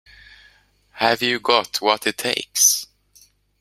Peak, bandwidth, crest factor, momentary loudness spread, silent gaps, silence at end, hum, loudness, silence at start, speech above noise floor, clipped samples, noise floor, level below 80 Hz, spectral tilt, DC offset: -2 dBFS; 16 kHz; 22 dB; 8 LU; none; 0.75 s; 50 Hz at -60 dBFS; -18 LUFS; 0.95 s; 36 dB; under 0.1%; -56 dBFS; -62 dBFS; -0.5 dB/octave; under 0.1%